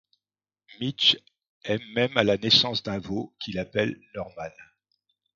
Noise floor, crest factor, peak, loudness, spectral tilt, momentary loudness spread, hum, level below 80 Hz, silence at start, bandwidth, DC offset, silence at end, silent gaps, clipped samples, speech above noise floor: under -90 dBFS; 24 dB; -4 dBFS; -24 LUFS; -4.5 dB/octave; 18 LU; 50 Hz at -50 dBFS; -58 dBFS; 0.8 s; 7.6 kHz; under 0.1%; 0.7 s; 1.49-1.61 s; under 0.1%; over 64 dB